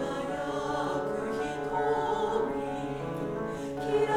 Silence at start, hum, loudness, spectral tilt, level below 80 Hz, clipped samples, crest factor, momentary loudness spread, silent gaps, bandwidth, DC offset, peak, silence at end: 0 s; none; -32 LUFS; -6 dB/octave; -54 dBFS; under 0.1%; 16 dB; 6 LU; none; 13.5 kHz; under 0.1%; -14 dBFS; 0 s